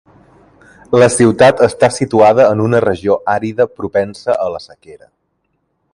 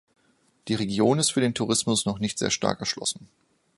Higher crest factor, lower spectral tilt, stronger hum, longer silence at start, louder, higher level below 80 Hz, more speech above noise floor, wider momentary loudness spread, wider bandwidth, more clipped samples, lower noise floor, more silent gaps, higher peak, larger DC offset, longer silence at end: second, 14 dB vs 24 dB; first, -5.5 dB/octave vs -4 dB/octave; neither; first, 0.9 s vs 0.65 s; first, -12 LUFS vs -25 LUFS; first, -46 dBFS vs -58 dBFS; first, 54 dB vs 40 dB; about the same, 9 LU vs 9 LU; about the same, 11.5 kHz vs 11.5 kHz; neither; about the same, -66 dBFS vs -66 dBFS; neither; first, 0 dBFS vs -4 dBFS; neither; first, 0.95 s vs 0.55 s